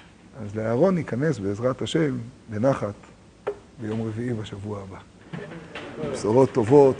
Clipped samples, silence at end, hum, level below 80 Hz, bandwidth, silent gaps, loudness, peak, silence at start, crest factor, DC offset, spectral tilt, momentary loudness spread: under 0.1%; 0 s; none; -56 dBFS; 10 kHz; none; -25 LUFS; -4 dBFS; 0.35 s; 20 dB; under 0.1%; -7 dB/octave; 18 LU